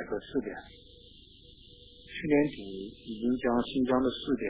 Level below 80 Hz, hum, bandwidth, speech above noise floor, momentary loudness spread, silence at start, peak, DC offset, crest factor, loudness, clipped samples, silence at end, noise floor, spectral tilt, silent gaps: -56 dBFS; none; 4 kHz; 24 dB; 24 LU; 0 s; -14 dBFS; under 0.1%; 18 dB; -31 LUFS; under 0.1%; 0 s; -54 dBFS; -4.5 dB/octave; none